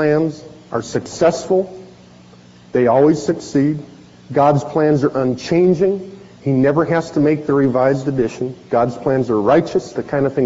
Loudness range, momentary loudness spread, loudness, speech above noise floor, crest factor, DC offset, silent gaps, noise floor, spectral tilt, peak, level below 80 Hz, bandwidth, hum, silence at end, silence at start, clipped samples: 2 LU; 10 LU; -17 LUFS; 28 dB; 14 dB; under 0.1%; none; -43 dBFS; -7 dB/octave; -2 dBFS; -52 dBFS; 8 kHz; none; 0 s; 0 s; under 0.1%